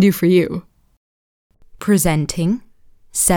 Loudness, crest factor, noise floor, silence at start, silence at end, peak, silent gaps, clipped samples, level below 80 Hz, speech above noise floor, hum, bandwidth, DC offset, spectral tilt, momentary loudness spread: -18 LUFS; 16 dB; -43 dBFS; 0 s; 0 s; -2 dBFS; 0.97-1.50 s; under 0.1%; -40 dBFS; 27 dB; none; over 20 kHz; under 0.1%; -5 dB/octave; 11 LU